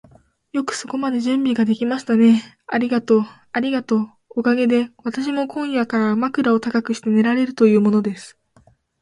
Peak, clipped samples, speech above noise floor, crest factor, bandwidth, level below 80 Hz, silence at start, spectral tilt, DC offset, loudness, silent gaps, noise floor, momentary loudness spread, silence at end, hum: -2 dBFS; under 0.1%; 37 dB; 16 dB; 11 kHz; -64 dBFS; 0.55 s; -6 dB/octave; under 0.1%; -19 LUFS; none; -55 dBFS; 10 LU; 0.7 s; none